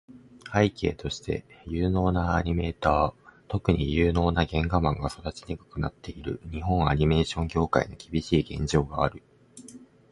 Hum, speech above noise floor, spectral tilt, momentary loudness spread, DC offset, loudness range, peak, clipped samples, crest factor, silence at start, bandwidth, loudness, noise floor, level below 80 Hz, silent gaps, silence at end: none; 23 dB; -6.5 dB/octave; 12 LU; under 0.1%; 2 LU; -6 dBFS; under 0.1%; 22 dB; 0.1 s; 11.5 kHz; -27 LUFS; -49 dBFS; -38 dBFS; none; 0.25 s